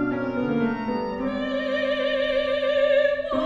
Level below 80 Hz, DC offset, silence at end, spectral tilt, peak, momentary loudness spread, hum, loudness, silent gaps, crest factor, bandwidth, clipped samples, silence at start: -50 dBFS; under 0.1%; 0 s; -6.5 dB/octave; -10 dBFS; 7 LU; none; -24 LUFS; none; 12 dB; 7.4 kHz; under 0.1%; 0 s